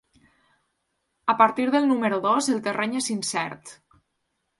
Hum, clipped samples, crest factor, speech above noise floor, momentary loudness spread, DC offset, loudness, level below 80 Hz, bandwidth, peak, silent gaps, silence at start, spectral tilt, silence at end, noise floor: none; under 0.1%; 20 dB; 53 dB; 10 LU; under 0.1%; -23 LUFS; -70 dBFS; 11.5 kHz; -4 dBFS; none; 1.25 s; -3.5 dB/octave; 0.85 s; -76 dBFS